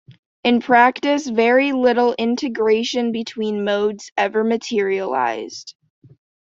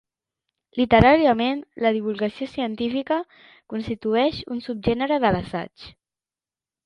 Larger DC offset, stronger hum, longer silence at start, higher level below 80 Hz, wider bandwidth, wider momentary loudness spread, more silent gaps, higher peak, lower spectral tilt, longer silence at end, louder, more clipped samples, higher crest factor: neither; neither; second, 0.1 s vs 0.75 s; second, -66 dBFS vs -44 dBFS; second, 7.8 kHz vs 9.6 kHz; second, 9 LU vs 16 LU; first, 0.19-0.43 s, 4.12-4.16 s vs none; about the same, -2 dBFS vs 0 dBFS; second, -4.5 dB/octave vs -8 dB/octave; second, 0.75 s vs 0.95 s; first, -18 LUFS vs -22 LUFS; neither; about the same, 18 dB vs 22 dB